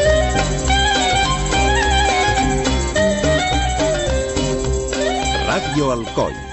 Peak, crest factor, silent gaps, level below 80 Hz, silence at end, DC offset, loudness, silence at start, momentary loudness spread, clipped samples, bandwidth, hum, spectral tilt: -2 dBFS; 14 dB; none; -24 dBFS; 0 s; under 0.1%; -17 LUFS; 0 s; 5 LU; under 0.1%; 8.4 kHz; none; -4 dB/octave